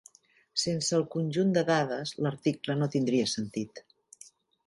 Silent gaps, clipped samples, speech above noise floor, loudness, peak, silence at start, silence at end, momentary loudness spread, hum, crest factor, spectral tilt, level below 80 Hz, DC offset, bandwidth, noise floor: none; under 0.1%; 31 dB; -29 LUFS; -12 dBFS; 0.55 s; 0.85 s; 7 LU; none; 18 dB; -5 dB/octave; -70 dBFS; under 0.1%; 11.5 kHz; -60 dBFS